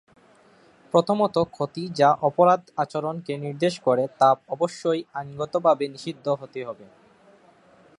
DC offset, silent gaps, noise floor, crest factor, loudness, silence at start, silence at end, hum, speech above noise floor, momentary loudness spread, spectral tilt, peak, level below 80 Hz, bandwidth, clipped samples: under 0.1%; none; -56 dBFS; 20 dB; -23 LUFS; 0.95 s; 1.15 s; none; 33 dB; 12 LU; -6 dB/octave; -4 dBFS; -66 dBFS; 11 kHz; under 0.1%